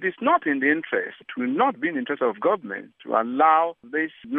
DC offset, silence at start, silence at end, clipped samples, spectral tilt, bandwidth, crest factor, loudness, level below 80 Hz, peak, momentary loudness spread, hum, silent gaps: under 0.1%; 0 s; 0 s; under 0.1%; -8.5 dB/octave; 3.9 kHz; 18 dB; -23 LUFS; -80 dBFS; -6 dBFS; 9 LU; none; none